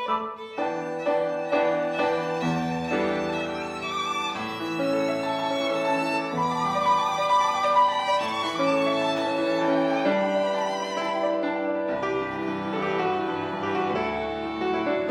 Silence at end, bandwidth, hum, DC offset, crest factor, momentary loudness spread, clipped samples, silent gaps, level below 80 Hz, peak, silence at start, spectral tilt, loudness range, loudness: 0 s; 13 kHz; none; under 0.1%; 16 dB; 7 LU; under 0.1%; none; -60 dBFS; -10 dBFS; 0 s; -5 dB/octave; 4 LU; -25 LUFS